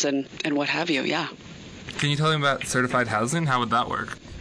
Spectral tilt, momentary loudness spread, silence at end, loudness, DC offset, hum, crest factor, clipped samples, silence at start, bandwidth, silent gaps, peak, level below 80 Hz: -4.5 dB/octave; 13 LU; 0 s; -24 LUFS; under 0.1%; none; 14 dB; under 0.1%; 0 s; 11 kHz; none; -10 dBFS; -54 dBFS